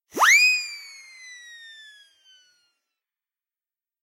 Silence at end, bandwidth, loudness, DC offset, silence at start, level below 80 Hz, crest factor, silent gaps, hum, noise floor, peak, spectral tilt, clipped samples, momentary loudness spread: 2.7 s; 16 kHz; -16 LUFS; under 0.1%; 0.15 s; -84 dBFS; 20 dB; none; none; under -90 dBFS; -6 dBFS; 2.5 dB/octave; under 0.1%; 28 LU